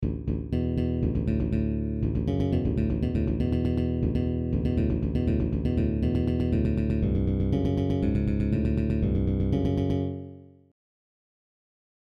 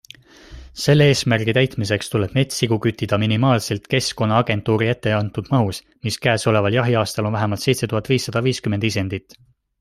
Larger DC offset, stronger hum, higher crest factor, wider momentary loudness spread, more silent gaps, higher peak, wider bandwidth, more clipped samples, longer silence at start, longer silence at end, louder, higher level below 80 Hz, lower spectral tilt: neither; neither; about the same, 14 dB vs 18 dB; about the same, 3 LU vs 5 LU; neither; second, -12 dBFS vs -2 dBFS; second, 6 kHz vs 15.5 kHz; neither; second, 0 s vs 0.5 s; first, 1.6 s vs 0.6 s; second, -27 LUFS vs -19 LUFS; first, -34 dBFS vs -50 dBFS; first, -10.5 dB/octave vs -5.5 dB/octave